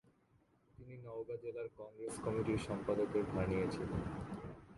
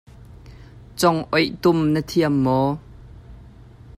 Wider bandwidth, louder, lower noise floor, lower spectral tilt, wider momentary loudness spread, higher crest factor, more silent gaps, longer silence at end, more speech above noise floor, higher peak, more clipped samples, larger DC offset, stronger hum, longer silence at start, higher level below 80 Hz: second, 11.5 kHz vs 15.5 kHz; second, -41 LUFS vs -20 LUFS; first, -73 dBFS vs -44 dBFS; about the same, -7 dB/octave vs -6 dB/octave; first, 12 LU vs 6 LU; about the same, 18 dB vs 18 dB; neither; second, 0 s vs 0.55 s; first, 33 dB vs 25 dB; second, -24 dBFS vs -4 dBFS; neither; neither; neither; first, 0.8 s vs 0.2 s; second, -58 dBFS vs -46 dBFS